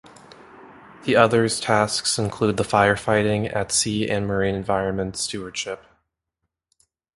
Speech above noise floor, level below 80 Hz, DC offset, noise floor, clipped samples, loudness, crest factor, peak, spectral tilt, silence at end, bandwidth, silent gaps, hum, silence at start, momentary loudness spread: 59 dB; -50 dBFS; under 0.1%; -80 dBFS; under 0.1%; -21 LUFS; 22 dB; 0 dBFS; -4 dB/octave; 1.4 s; 11.5 kHz; none; none; 0.55 s; 11 LU